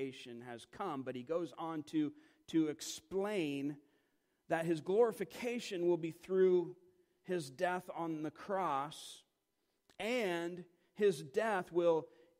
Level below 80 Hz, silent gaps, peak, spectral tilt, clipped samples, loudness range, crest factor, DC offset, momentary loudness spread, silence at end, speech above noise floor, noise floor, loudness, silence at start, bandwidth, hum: -80 dBFS; none; -20 dBFS; -5.5 dB/octave; under 0.1%; 5 LU; 18 dB; under 0.1%; 15 LU; 0.35 s; 46 dB; -84 dBFS; -38 LUFS; 0 s; 16 kHz; none